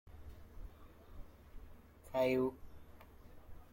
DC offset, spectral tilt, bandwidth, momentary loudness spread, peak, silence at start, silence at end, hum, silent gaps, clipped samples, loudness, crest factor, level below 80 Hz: under 0.1%; -7 dB/octave; 16.5 kHz; 26 LU; -22 dBFS; 0.05 s; 0.05 s; none; none; under 0.1%; -37 LUFS; 20 dB; -58 dBFS